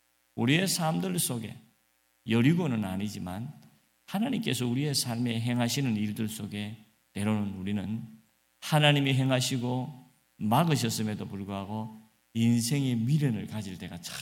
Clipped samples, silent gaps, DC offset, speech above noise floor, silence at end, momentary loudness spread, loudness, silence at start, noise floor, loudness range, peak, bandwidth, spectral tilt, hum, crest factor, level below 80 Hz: under 0.1%; none; under 0.1%; 42 dB; 0 s; 14 LU; -29 LUFS; 0.35 s; -71 dBFS; 4 LU; -6 dBFS; 17 kHz; -5 dB/octave; none; 22 dB; -68 dBFS